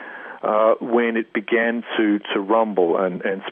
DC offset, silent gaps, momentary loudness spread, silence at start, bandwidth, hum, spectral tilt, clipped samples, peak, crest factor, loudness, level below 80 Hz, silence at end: under 0.1%; none; 6 LU; 0 s; 3.8 kHz; none; -9 dB/octave; under 0.1%; -6 dBFS; 14 dB; -20 LUFS; -78 dBFS; 0 s